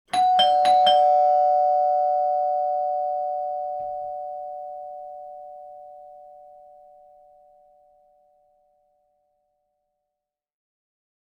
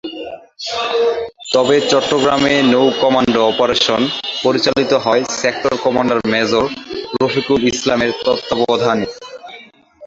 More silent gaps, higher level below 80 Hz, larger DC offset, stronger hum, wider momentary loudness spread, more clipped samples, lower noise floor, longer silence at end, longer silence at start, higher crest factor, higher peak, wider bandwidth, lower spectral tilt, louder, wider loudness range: neither; second, -68 dBFS vs -50 dBFS; neither; neither; first, 23 LU vs 12 LU; neither; first, -86 dBFS vs -40 dBFS; first, 5 s vs 0 s; about the same, 0.15 s vs 0.05 s; about the same, 18 dB vs 16 dB; second, -8 dBFS vs 0 dBFS; first, 10.5 kHz vs 8 kHz; second, -2 dB/octave vs -4 dB/octave; second, -21 LUFS vs -15 LUFS; first, 24 LU vs 3 LU